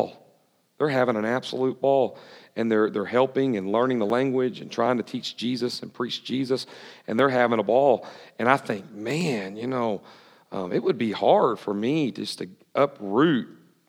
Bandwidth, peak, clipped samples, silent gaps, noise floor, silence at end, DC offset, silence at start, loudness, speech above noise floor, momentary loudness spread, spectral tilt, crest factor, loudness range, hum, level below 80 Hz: 15 kHz; -2 dBFS; under 0.1%; none; -64 dBFS; 0.35 s; under 0.1%; 0 s; -25 LUFS; 40 dB; 11 LU; -6 dB/octave; 22 dB; 2 LU; none; -82 dBFS